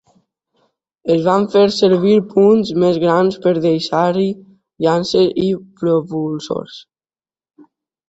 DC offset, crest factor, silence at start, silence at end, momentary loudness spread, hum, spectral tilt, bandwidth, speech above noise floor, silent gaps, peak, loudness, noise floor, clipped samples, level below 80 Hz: under 0.1%; 14 dB; 1.05 s; 1.3 s; 10 LU; none; -6.5 dB/octave; 8 kHz; over 75 dB; none; -2 dBFS; -15 LUFS; under -90 dBFS; under 0.1%; -56 dBFS